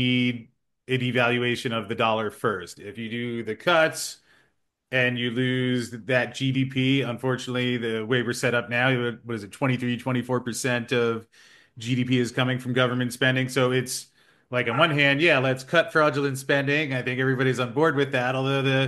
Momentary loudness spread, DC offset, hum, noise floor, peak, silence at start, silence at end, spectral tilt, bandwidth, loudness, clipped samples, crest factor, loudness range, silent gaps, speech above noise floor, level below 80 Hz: 9 LU; under 0.1%; none; -70 dBFS; -4 dBFS; 0 s; 0 s; -5 dB/octave; 12.5 kHz; -24 LUFS; under 0.1%; 20 dB; 4 LU; none; 46 dB; -66 dBFS